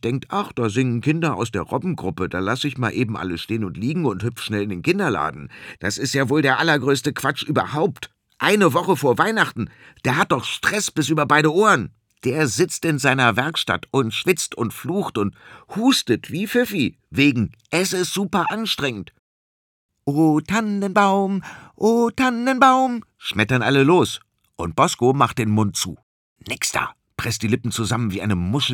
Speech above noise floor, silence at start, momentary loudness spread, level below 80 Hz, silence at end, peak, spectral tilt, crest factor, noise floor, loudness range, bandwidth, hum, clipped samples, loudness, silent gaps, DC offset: over 70 dB; 0.05 s; 10 LU; -56 dBFS; 0 s; -2 dBFS; -4.5 dB/octave; 20 dB; under -90 dBFS; 5 LU; 20 kHz; none; under 0.1%; -20 LUFS; 19.19-19.89 s, 26.03-26.36 s; under 0.1%